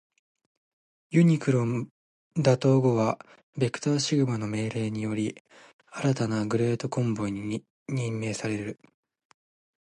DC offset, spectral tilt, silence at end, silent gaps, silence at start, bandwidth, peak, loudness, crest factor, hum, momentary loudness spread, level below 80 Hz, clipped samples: under 0.1%; -6.5 dB/octave; 1.1 s; 1.91-2.31 s, 3.43-3.53 s, 5.40-5.45 s, 5.73-5.79 s, 7.70-7.86 s; 1.1 s; 10.5 kHz; -8 dBFS; -27 LUFS; 18 dB; none; 13 LU; -64 dBFS; under 0.1%